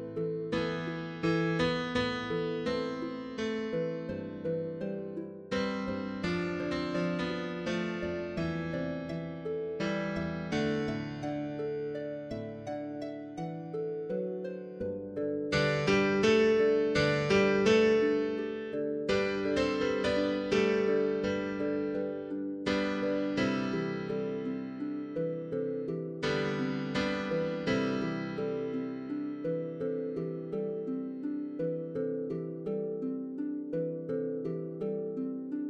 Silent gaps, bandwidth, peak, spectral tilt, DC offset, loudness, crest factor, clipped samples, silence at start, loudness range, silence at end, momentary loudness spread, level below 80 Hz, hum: none; 9.4 kHz; -12 dBFS; -6.5 dB/octave; under 0.1%; -32 LUFS; 20 dB; under 0.1%; 0 s; 8 LU; 0 s; 10 LU; -58 dBFS; none